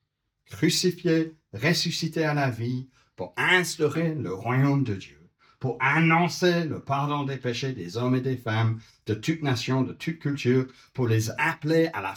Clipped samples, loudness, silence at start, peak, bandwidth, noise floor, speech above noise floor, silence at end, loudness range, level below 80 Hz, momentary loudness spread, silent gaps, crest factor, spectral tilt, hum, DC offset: under 0.1%; -26 LUFS; 0.5 s; -6 dBFS; 19.5 kHz; -68 dBFS; 43 dB; 0 s; 3 LU; -66 dBFS; 10 LU; none; 20 dB; -5.5 dB/octave; none; under 0.1%